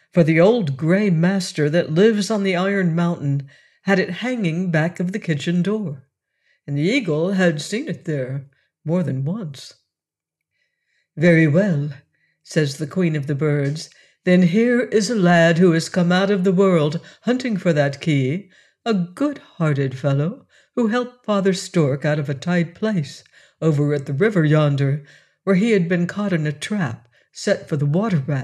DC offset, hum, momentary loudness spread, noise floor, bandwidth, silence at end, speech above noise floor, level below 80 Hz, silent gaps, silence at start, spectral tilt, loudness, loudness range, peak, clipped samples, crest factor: under 0.1%; none; 11 LU; -88 dBFS; 11.5 kHz; 0 s; 69 dB; -66 dBFS; none; 0.15 s; -6.5 dB/octave; -20 LUFS; 5 LU; -4 dBFS; under 0.1%; 16 dB